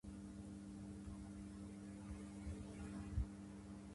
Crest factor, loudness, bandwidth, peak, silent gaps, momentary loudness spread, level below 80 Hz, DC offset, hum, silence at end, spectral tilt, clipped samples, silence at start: 20 dB; -52 LUFS; 11.5 kHz; -30 dBFS; none; 7 LU; -56 dBFS; under 0.1%; none; 0 s; -7 dB/octave; under 0.1%; 0.05 s